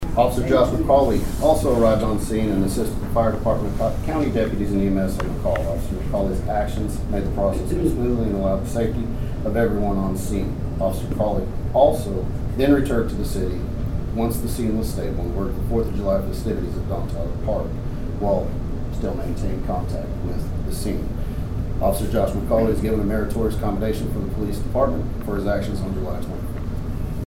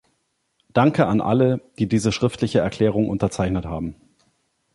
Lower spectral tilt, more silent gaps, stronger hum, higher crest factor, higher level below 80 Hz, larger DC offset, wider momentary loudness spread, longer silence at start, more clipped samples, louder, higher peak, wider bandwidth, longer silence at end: about the same, -7.5 dB/octave vs -6.5 dB/octave; neither; neither; about the same, 18 dB vs 18 dB; first, -28 dBFS vs -44 dBFS; neither; about the same, 9 LU vs 7 LU; second, 0 s vs 0.75 s; neither; about the same, -23 LUFS vs -21 LUFS; about the same, -4 dBFS vs -2 dBFS; first, 16.5 kHz vs 11.5 kHz; second, 0 s vs 0.8 s